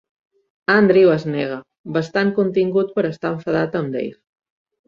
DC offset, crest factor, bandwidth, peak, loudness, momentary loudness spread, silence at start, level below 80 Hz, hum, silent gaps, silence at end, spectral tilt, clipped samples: under 0.1%; 18 dB; 7.2 kHz; -2 dBFS; -19 LUFS; 13 LU; 0.7 s; -60 dBFS; none; 1.79-1.84 s; 0.75 s; -7.5 dB/octave; under 0.1%